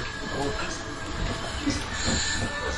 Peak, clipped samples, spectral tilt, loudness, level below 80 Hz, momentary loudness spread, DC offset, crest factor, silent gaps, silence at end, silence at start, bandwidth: -12 dBFS; under 0.1%; -3.5 dB/octave; -29 LUFS; -38 dBFS; 7 LU; under 0.1%; 16 dB; none; 0 s; 0 s; 11.5 kHz